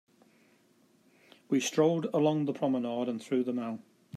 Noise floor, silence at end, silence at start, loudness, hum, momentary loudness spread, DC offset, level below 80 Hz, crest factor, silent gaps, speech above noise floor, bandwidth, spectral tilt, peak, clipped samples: -66 dBFS; 0 s; 1.5 s; -30 LUFS; none; 8 LU; under 0.1%; -82 dBFS; 18 dB; none; 37 dB; 14.5 kHz; -5.5 dB/octave; -14 dBFS; under 0.1%